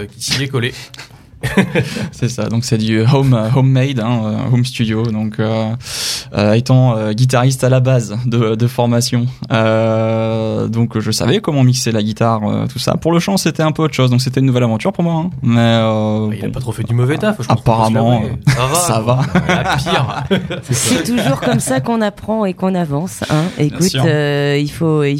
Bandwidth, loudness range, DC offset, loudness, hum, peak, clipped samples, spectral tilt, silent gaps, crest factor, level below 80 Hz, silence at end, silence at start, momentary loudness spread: 16 kHz; 2 LU; under 0.1%; -15 LUFS; none; 0 dBFS; under 0.1%; -5.5 dB/octave; none; 14 dB; -42 dBFS; 0 s; 0 s; 6 LU